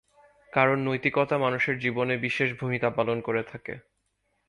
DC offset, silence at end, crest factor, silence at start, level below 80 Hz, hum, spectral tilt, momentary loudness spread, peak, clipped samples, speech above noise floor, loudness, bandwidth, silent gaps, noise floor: under 0.1%; 0.7 s; 22 dB; 0.55 s; -64 dBFS; none; -7 dB/octave; 11 LU; -6 dBFS; under 0.1%; 48 dB; -26 LUFS; 11 kHz; none; -75 dBFS